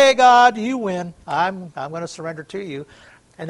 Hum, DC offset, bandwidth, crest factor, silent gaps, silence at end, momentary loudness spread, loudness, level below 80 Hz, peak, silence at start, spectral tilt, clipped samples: none; under 0.1%; 11.5 kHz; 18 dB; none; 0 s; 19 LU; -17 LUFS; -60 dBFS; 0 dBFS; 0 s; -4 dB/octave; under 0.1%